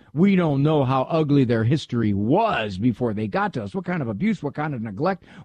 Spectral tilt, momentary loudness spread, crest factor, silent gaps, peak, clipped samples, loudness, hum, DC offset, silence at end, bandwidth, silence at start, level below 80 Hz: -8.5 dB/octave; 8 LU; 14 dB; none; -8 dBFS; under 0.1%; -22 LUFS; none; under 0.1%; 0 s; 9.2 kHz; 0.15 s; -54 dBFS